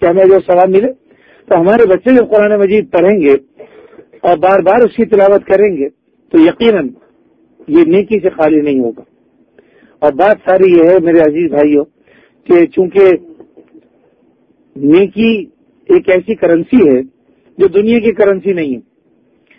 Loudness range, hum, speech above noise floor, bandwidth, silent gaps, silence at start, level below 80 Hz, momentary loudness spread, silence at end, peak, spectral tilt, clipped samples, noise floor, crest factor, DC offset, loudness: 4 LU; none; 44 dB; 5 kHz; none; 0 s; -48 dBFS; 8 LU; 0.8 s; 0 dBFS; -9 dB/octave; 0.5%; -53 dBFS; 10 dB; under 0.1%; -10 LUFS